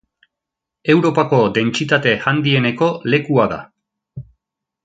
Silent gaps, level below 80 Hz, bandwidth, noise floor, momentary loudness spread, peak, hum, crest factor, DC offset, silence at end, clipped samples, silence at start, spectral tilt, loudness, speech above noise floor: none; -54 dBFS; 9 kHz; -83 dBFS; 14 LU; 0 dBFS; none; 18 dB; under 0.1%; 0.6 s; under 0.1%; 0.85 s; -6 dB/octave; -16 LUFS; 68 dB